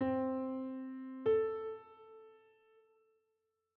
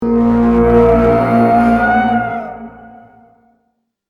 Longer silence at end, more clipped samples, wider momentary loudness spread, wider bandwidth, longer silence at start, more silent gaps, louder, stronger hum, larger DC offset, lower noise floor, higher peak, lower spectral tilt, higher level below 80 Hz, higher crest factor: first, 1.4 s vs 1.2 s; neither; first, 24 LU vs 13 LU; second, 4.3 kHz vs 5.2 kHz; about the same, 0 s vs 0 s; neither; second, -38 LUFS vs -11 LUFS; neither; neither; first, -84 dBFS vs -66 dBFS; second, -24 dBFS vs 0 dBFS; second, -6.5 dB/octave vs -9 dB/octave; second, -78 dBFS vs -30 dBFS; about the same, 16 dB vs 14 dB